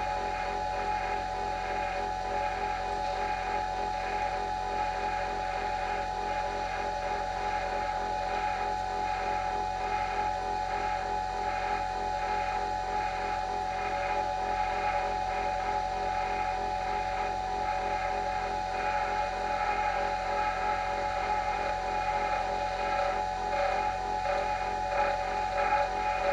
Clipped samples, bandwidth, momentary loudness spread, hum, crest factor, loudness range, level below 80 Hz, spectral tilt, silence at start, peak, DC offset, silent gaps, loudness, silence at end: under 0.1%; 11.5 kHz; 3 LU; none; 14 dB; 2 LU; -46 dBFS; -4 dB/octave; 0 s; -16 dBFS; under 0.1%; none; -31 LUFS; 0 s